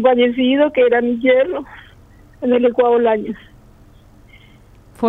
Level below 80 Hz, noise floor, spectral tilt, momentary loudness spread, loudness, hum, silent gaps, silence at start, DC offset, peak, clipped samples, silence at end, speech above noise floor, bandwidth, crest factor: -50 dBFS; -45 dBFS; -7 dB/octave; 14 LU; -15 LUFS; none; none; 0 s; under 0.1%; -2 dBFS; under 0.1%; 0 s; 31 dB; 3.9 kHz; 16 dB